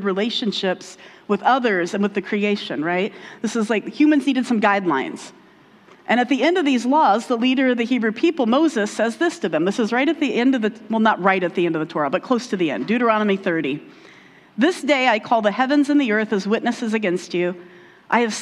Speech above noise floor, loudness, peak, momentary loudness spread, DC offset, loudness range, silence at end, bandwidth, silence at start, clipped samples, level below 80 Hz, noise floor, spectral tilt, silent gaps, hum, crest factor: 30 dB; -20 LUFS; -2 dBFS; 7 LU; under 0.1%; 3 LU; 0 s; 11.5 kHz; 0 s; under 0.1%; -72 dBFS; -50 dBFS; -5 dB/octave; none; none; 18 dB